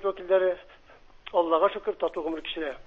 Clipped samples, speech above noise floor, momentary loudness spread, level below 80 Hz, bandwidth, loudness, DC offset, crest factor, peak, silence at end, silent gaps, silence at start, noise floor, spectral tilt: under 0.1%; 25 dB; 9 LU; -60 dBFS; 5.8 kHz; -27 LUFS; under 0.1%; 18 dB; -10 dBFS; 0.05 s; none; 0 s; -52 dBFS; -6 dB/octave